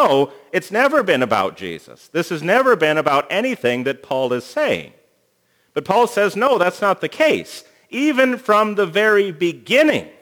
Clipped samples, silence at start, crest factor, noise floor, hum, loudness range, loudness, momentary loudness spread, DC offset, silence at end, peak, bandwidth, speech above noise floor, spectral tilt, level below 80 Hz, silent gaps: under 0.1%; 0 s; 18 dB; -63 dBFS; none; 3 LU; -17 LUFS; 10 LU; under 0.1%; 0.1 s; 0 dBFS; over 20 kHz; 45 dB; -4.5 dB/octave; -68 dBFS; none